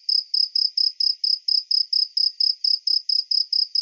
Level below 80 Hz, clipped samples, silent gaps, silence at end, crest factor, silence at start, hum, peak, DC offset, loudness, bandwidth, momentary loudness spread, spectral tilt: under -90 dBFS; under 0.1%; none; 0 s; 14 dB; 0.1 s; none; -8 dBFS; under 0.1%; -19 LUFS; 7 kHz; 2 LU; 11 dB/octave